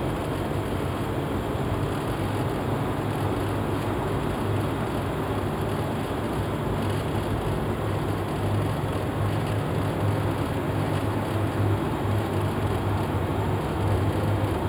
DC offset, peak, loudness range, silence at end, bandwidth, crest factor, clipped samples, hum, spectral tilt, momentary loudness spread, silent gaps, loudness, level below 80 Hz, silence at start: under 0.1%; -12 dBFS; 1 LU; 0 s; over 20 kHz; 14 dB; under 0.1%; none; -7 dB/octave; 3 LU; none; -27 LUFS; -40 dBFS; 0 s